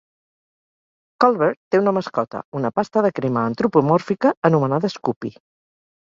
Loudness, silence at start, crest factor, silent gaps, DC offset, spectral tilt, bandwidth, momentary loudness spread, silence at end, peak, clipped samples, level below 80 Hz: -20 LUFS; 1.2 s; 20 dB; 1.57-1.71 s, 2.44-2.52 s, 4.37-4.42 s, 5.16-5.21 s; under 0.1%; -8 dB/octave; 7.6 kHz; 9 LU; 0.8 s; -2 dBFS; under 0.1%; -62 dBFS